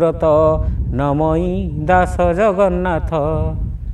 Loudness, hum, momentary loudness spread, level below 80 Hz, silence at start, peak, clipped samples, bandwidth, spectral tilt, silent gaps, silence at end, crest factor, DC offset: -16 LUFS; none; 7 LU; -24 dBFS; 0 s; 0 dBFS; under 0.1%; 11.5 kHz; -8.5 dB/octave; none; 0 s; 16 dB; under 0.1%